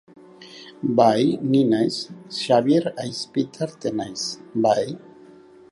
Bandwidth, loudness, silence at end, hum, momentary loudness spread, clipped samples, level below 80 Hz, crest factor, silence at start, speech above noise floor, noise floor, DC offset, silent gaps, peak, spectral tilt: 11.5 kHz; -22 LUFS; 0.75 s; none; 14 LU; under 0.1%; -66 dBFS; 20 dB; 0.4 s; 26 dB; -47 dBFS; under 0.1%; none; -4 dBFS; -5.5 dB/octave